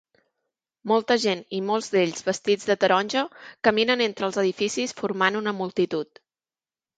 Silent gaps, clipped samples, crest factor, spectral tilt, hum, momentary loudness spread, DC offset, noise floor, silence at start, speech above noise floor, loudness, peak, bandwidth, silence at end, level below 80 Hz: none; under 0.1%; 20 dB; -4 dB/octave; none; 7 LU; under 0.1%; under -90 dBFS; 0.85 s; over 66 dB; -24 LUFS; -6 dBFS; 9.4 kHz; 0.95 s; -70 dBFS